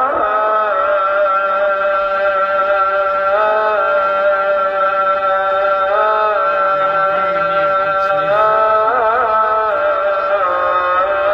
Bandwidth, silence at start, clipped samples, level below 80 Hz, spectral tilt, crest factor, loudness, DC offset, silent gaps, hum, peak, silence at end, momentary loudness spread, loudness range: 5.8 kHz; 0 s; under 0.1%; -50 dBFS; -5 dB/octave; 12 dB; -14 LUFS; under 0.1%; none; none; -4 dBFS; 0 s; 2 LU; 1 LU